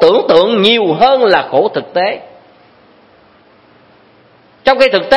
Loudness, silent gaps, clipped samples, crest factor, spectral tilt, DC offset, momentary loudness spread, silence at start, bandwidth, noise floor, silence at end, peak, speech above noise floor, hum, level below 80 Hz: -11 LUFS; none; 0.3%; 12 dB; -5.5 dB/octave; under 0.1%; 7 LU; 0 s; 11 kHz; -46 dBFS; 0 s; 0 dBFS; 36 dB; none; -50 dBFS